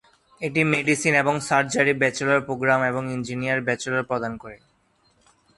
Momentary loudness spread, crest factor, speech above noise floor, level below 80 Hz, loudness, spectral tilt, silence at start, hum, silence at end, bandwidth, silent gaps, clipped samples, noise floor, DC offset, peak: 9 LU; 20 dB; 41 dB; -60 dBFS; -22 LUFS; -4.5 dB/octave; 0.4 s; none; 1 s; 11.5 kHz; none; under 0.1%; -64 dBFS; under 0.1%; -4 dBFS